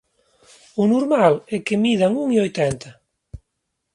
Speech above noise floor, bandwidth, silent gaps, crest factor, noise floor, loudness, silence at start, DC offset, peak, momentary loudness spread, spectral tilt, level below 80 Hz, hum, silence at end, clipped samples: 58 dB; 11.5 kHz; none; 18 dB; -77 dBFS; -19 LUFS; 0.75 s; under 0.1%; -2 dBFS; 7 LU; -6 dB/octave; -52 dBFS; none; 0.55 s; under 0.1%